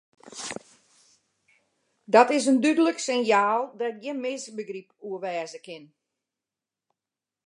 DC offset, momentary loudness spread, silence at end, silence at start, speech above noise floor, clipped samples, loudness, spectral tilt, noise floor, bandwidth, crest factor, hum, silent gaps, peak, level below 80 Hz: under 0.1%; 20 LU; 1.65 s; 0.25 s; 65 dB; under 0.1%; -24 LUFS; -3.5 dB/octave; -90 dBFS; 11.5 kHz; 24 dB; none; none; -2 dBFS; -80 dBFS